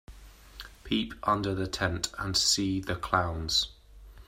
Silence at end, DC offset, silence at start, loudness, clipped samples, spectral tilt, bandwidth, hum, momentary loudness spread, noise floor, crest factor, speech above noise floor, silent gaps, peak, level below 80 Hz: 0.05 s; under 0.1%; 0.1 s; -29 LUFS; under 0.1%; -3 dB/octave; 16 kHz; none; 17 LU; -50 dBFS; 22 dB; 21 dB; none; -8 dBFS; -48 dBFS